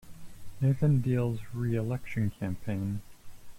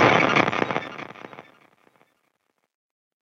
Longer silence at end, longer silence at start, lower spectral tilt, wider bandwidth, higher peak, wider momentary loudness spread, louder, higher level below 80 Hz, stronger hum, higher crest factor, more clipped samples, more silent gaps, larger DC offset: second, 0 s vs 1.8 s; about the same, 0.05 s vs 0 s; first, -9 dB/octave vs -5 dB/octave; first, 16 kHz vs 8 kHz; second, -16 dBFS vs 0 dBFS; second, 9 LU vs 24 LU; second, -31 LUFS vs -21 LUFS; first, -52 dBFS vs -66 dBFS; neither; second, 14 dB vs 24 dB; neither; neither; neither